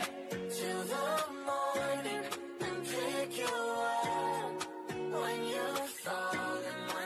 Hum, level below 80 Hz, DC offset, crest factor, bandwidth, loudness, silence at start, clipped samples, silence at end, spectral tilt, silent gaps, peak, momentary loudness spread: none; -76 dBFS; under 0.1%; 14 dB; 14 kHz; -36 LUFS; 0 s; under 0.1%; 0 s; -3 dB/octave; none; -22 dBFS; 5 LU